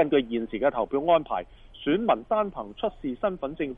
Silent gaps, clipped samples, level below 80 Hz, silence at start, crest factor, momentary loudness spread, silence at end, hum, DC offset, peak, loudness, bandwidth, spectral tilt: none; under 0.1%; -52 dBFS; 0 s; 18 dB; 9 LU; 0 s; none; under 0.1%; -8 dBFS; -27 LUFS; 3.9 kHz; -9 dB/octave